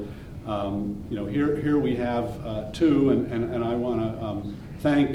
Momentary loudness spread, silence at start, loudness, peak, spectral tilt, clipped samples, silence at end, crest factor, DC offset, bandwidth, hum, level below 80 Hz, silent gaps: 11 LU; 0 s; -26 LUFS; -10 dBFS; -8 dB/octave; under 0.1%; 0 s; 16 dB; under 0.1%; 12 kHz; none; -46 dBFS; none